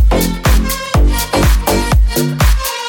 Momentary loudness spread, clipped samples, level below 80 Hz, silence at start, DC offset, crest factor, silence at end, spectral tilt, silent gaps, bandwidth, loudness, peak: 2 LU; under 0.1%; -14 dBFS; 0 s; under 0.1%; 12 dB; 0 s; -5 dB/octave; none; 18.5 kHz; -13 LUFS; 0 dBFS